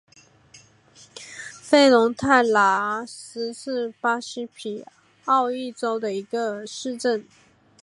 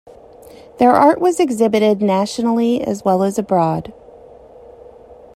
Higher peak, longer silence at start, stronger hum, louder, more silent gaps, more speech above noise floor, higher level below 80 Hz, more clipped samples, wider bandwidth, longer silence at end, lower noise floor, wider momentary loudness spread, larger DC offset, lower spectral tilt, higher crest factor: second, -4 dBFS vs 0 dBFS; second, 0.55 s vs 0.8 s; neither; second, -22 LUFS vs -15 LUFS; neither; first, 31 dB vs 26 dB; second, -64 dBFS vs -54 dBFS; neither; second, 11.5 kHz vs 14 kHz; first, 0.6 s vs 0.25 s; first, -53 dBFS vs -41 dBFS; first, 19 LU vs 7 LU; neither; second, -3.5 dB/octave vs -6 dB/octave; about the same, 20 dB vs 16 dB